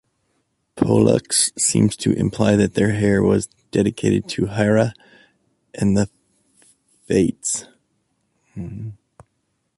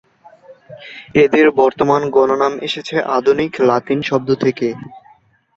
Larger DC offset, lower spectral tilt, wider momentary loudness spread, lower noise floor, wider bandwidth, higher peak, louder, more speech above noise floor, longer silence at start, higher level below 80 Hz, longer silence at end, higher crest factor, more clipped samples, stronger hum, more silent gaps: neither; about the same, -5 dB/octave vs -6 dB/octave; first, 16 LU vs 11 LU; first, -71 dBFS vs -51 dBFS; first, 11.5 kHz vs 7.6 kHz; about the same, -2 dBFS vs -2 dBFS; second, -19 LUFS vs -15 LUFS; first, 53 dB vs 36 dB; first, 0.75 s vs 0.5 s; first, -46 dBFS vs -54 dBFS; first, 0.85 s vs 0.6 s; about the same, 18 dB vs 14 dB; neither; neither; neither